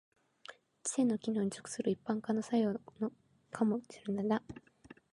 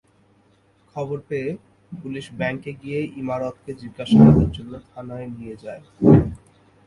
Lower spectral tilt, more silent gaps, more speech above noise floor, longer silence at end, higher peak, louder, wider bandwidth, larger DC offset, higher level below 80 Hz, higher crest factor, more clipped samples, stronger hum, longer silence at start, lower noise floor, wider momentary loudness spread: second, -5.5 dB/octave vs -9 dB/octave; neither; second, 22 dB vs 38 dB; about the same, 0.55 s vs 0.5 s; second, -18 dBFS vs 0 dBFS; second, -36 LUFS vs -19 LUFS; about the same, 11.5 kHz vs 10.5 kHz; neither; second, -74 dBFS vs -40 dBFS; about the same, 18 dB vs 22 dB; neither; neither; second, 0.5 s vs 0.95 s; about the same, -57 dBFS vs -59 dBFS; about the same, 21 LU vs 23 LU